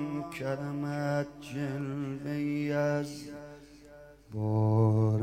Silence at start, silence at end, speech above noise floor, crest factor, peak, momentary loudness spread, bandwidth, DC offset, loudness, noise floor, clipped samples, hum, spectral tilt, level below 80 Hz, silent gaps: 0 s; 0 s; 23 dB; 14 dB; -16 dBFS; 18 LU; 9.8 kHz; under 0.1%; -32 LUFS; -53 dBFS; under 0.1%; none; -8 dB/octave; -62 dBFS; none